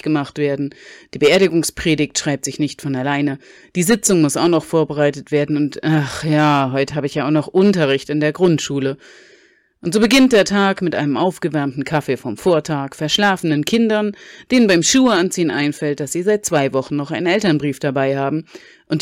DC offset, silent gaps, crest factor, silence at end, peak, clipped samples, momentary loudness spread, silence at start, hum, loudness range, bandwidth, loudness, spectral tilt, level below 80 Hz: under 0.1%; none; 14 dB; 0 s; -4 dBFS; under 0.1%; 9 LU; 0.05 s; none; 2 LU; 16.5 kHz; -17 LUFS; -4.5 dB/octave; -50 dBFS